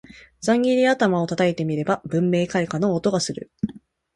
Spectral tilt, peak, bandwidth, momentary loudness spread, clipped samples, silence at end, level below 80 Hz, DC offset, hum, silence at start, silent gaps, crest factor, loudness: -5.5 dB/octave; -6 dBFS; 11.5 kHz; 11 LU; under 0.1%; 0.35 s; -56 dBFS; under 0.1%; none; 0.1 s; none; 16 dB; -22 LUFS